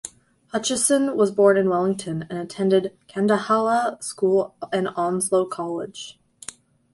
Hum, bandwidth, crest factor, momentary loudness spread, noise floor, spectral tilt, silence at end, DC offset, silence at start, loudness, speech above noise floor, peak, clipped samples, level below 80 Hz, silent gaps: none; 12 kHz; 18 dB; 19 LU; -43 dBFS; -4.5 dB/octave; 0.8 s; under 0.1%; 0.05 s; -22 LUFS; 22 dB; -4 dBFS; under 0.1%; -64 dBFS; none